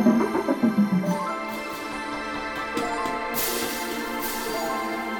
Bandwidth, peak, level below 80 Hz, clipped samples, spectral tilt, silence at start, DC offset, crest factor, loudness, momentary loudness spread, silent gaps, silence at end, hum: 18 kHz; -8 dBFS; -52 dBFS; under 0.1%; -4.5 dB/octave; 0 s; under 0.1%; 18 dB; -26 LUFS; 8 LU; none; 0 s; none